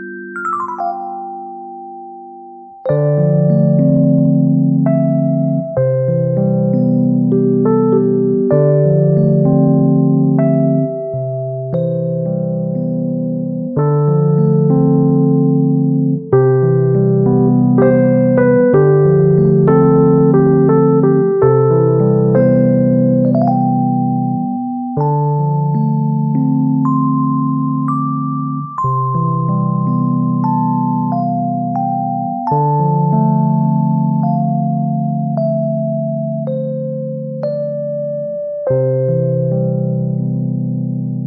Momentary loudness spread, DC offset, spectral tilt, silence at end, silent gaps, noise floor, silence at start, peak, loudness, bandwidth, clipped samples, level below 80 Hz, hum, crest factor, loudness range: 10 LU; under 0.1%; -12.5 dB/octave; 0 s; none; -34 dBFS; 0 s; 0 dBFS; -14 LUFS; 2.2 kHz; under 0.1%; -48 dBFS; none; 12 dB; 7 LU